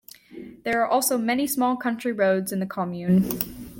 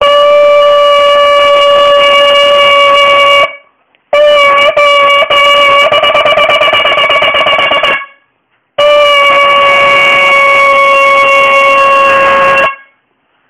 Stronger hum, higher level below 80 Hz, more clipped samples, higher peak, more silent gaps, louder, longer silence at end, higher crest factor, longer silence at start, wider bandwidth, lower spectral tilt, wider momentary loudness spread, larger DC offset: neither; second, -56 dBFS vs -44 dBFS; neither; second, -6 dBFS vs 0 dBFS; neither; second, -24 LUFS vs -5 LUFS; second, 0 s vs 0.75 s; first, 20 dB vs 6 dB; first, 0.3 s vs 0 s; first, 17 kHz vs 14 kHz; first, -5 dB/octave vs -1.5 dB/octave; first, 11 LU vs 3 LU; neither